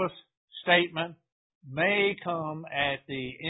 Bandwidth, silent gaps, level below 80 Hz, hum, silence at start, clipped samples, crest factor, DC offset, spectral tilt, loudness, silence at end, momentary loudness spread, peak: 4 kHz; 0.37-0.48 s, 1.32-1.61 s; -64 dBFS; none; 0 s; under 0.1%; 24 dB; under 0.1%; -9 dB/octave; -28 LUFS; 0 s; 13 LU; -6 dBFS